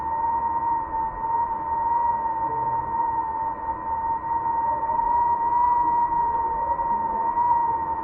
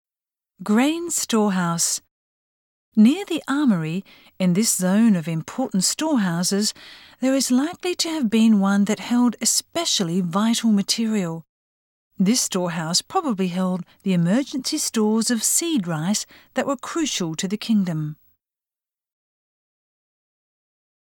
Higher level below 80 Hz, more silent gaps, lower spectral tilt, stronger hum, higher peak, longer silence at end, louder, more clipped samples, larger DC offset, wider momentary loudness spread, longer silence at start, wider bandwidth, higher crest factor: first, -48 dBFS vs -68 dBFS; second, none vs 2.11-2.92 s, 11.49-12.10 s; first, -10.5 dB/octave vs -4 dB/octave; neither; second, -10 dBFS vs -6 dBFS; second, 0 s vs 3 s; second, -24 LUFS vs -21 LUFS; neither; neither; about the same, 6 LU vs 8 LU; second, 0 s vs 0.6 s; second, 2.8 kHz vs 19 kHz; about the same, 12 dB vs 16 dB